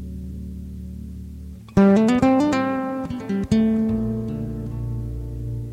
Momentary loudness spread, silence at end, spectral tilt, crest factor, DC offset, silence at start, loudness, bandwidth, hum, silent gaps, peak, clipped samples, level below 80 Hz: 19 LU; 0 s; -8 dB/octave; 14 dB; under 0.1%; 0 s; -21 LUFS; 11 kHz; none; none; -6 dBFS; under 0.1%; -36 dBFS